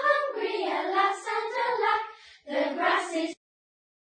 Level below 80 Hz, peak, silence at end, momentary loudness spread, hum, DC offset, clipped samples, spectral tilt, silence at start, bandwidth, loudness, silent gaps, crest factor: -80 dBFS; -12 dBFS; 0.75 s; 10 LU; none; under 0.1%; under 0.1%; -1.5 dB/octave; 0 s; 9.4 kHz; -28 LUFS; none; 18 dB